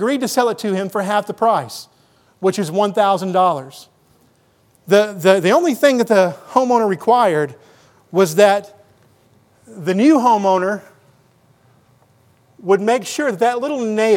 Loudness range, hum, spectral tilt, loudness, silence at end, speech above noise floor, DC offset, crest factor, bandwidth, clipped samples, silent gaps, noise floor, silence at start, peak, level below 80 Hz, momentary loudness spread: 5 LU; none; -5 dB/octave; -16 LUFS; 0 s; 41 dB; under 0.1%; 18 dB; 19 kHz; under 0.1%; none; -56 dBFS; 0 s; 0 dBFS; -72 dBFS; 9 LU